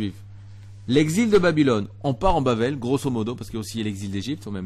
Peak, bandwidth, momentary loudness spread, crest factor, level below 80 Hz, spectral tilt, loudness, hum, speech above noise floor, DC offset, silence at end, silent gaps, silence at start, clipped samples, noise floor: -6 dBFS; 13 kHz; 12 LU; 16 dB; -40 dBFS; -6 dB/octave; -23 LUFS; 50 Hz at -40 dBFS; 20 dB; under 0.1%; 0 s; none; 0 s; under 0.1%; -42 dBFS